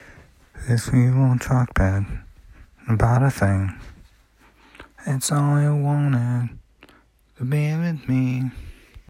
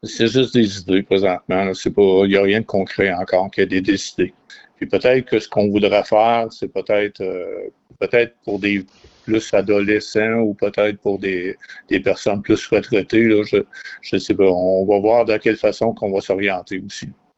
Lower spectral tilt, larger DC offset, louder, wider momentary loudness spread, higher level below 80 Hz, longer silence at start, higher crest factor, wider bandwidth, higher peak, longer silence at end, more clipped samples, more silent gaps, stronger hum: first, -7 dB/octave vs -5.5 dB/octave; neither; second, -21 LUFS vs -18 LUFS; about the same, 13 LU vs 11 LU; first, -38 dBFS vs -50 dBFS; about the same, 0.1 s vs 0.05 s; about the same, 18 dB vs 14 dB; first, 15.5 kHz vs 8.2 kHz; about the same, -4 dBFS vs -2 dBFS; second, 0.1 s vs 0.25 s; neither; neither; neither